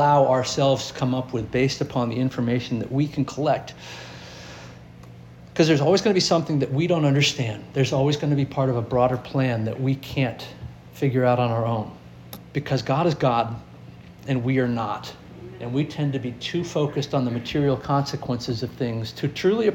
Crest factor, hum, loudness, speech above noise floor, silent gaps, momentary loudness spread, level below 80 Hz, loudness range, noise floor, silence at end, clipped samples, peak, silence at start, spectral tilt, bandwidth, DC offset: 18 dB; none; -23 LUFS; 21 dB; none; 18 LU; -52 dBFS; 5 LU; -43 dBFS; 0 s; under 0.1%; -6 dBFS; 0 s; -6 dB/octave; 16.5 kHz; under 0.1%